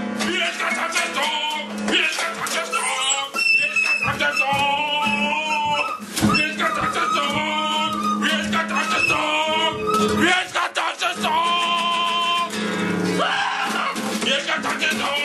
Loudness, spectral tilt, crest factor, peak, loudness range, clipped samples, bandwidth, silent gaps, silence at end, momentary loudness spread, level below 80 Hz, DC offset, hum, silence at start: -20 LUFS; -2.5 dB/octave; 16 dB; -4 dBFS; 2 LU; under 0.1%; 13 kHz; none; 0 s; 5 LU; -56 dBFS; under 0.1%; none; 0 s